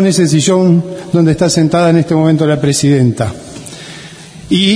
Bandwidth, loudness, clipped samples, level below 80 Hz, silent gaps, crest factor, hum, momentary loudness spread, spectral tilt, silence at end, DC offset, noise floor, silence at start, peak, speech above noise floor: 11 kHz; -11 LUFS; under 0.1%; -42 dBFS; none; 12 dB; none; 18 LU; -5.5 dB/octave; 0 s; under 0.1%; -32 dBFS; 0 s; 0 dBFS; 21 dB